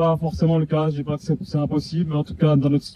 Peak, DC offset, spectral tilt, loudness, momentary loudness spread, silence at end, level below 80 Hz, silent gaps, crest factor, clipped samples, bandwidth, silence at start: -6 dBFS; under 0.1%; -8.5 dB/octave; -22 LUFS; 6 LU; 0 s; -44 dBFS; none; 16 dB; under 0.1%; 9.6 kHz; 0 s